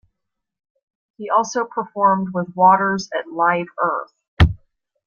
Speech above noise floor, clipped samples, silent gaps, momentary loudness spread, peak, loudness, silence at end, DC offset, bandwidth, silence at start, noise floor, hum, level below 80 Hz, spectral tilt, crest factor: 59 dB; under 0.1%; 4.28-4.37 s; 12 LU; 0 dBFS; -19 LUFS; 0.5 s; under 0.1%; 7.2 kHz; 1.2 s; -78 dBFS; none; -36 dBFS; -6 dB/octave; 20 dB